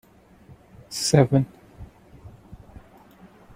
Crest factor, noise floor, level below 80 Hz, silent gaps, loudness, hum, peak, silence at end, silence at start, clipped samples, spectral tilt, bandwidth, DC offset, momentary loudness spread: 24 dB; -51 dBFS; -52 dBFS; none; -22 LUFS; none; -2 dBFS; 1 s; 0.9 s; under 0.1%; -5.5 dB/octave; 16 kHz; under 0.1%; 28 LU